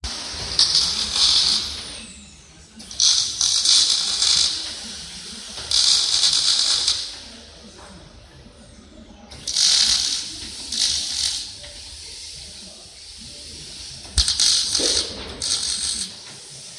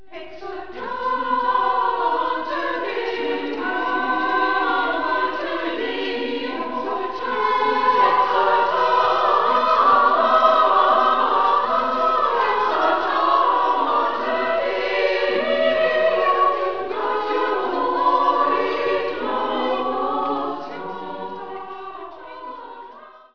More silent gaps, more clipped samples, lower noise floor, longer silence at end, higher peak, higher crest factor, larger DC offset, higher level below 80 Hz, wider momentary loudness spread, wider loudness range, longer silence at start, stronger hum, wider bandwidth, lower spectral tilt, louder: neither; neither; about the same, -46 dBFS vs -43 dBFS; about the same, 0 s vs 0 s; about the same, -2 dBFS vs -4 dBFS; about the same, 20 dB vs 16 dB; second, under 0.1% vs 1%; first, -44 dBFS vs -58 dBFS; first, 21 LU vs 15 LU; about the same, 8 LU vs 7 LU; about the same, 0.05 s vs 0.1 s; neither; first, 12 kHz vs 5.4 kHz; second, 0.5 dB/octave vs -4.5 dB/octave; first, -17 LUFS vs -20 LUFS